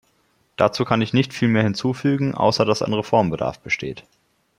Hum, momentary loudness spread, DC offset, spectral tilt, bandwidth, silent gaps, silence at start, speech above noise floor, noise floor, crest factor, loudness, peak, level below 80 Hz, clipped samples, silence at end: none; 7 LU; under 0.1%; -6 dB/octave; 12 kHz; none; 0.6 s; 43 dB; -63 dBFS; 20 dB; -20 LUFS; -2 dBFS; -54 dBFS; under 0.1%; 0.6 s